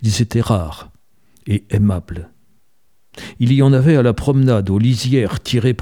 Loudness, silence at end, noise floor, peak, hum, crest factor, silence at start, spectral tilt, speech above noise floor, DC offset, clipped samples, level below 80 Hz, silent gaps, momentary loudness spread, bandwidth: -16 LUFS; 0.05 s; -66 dBFS; -2 dBFS; none; 14 dB; 0 s; -7 dB/octave; 51 dB; 0.3%; under 0.1%; -38 dBFS; none; 20 LU; 13.5 kHz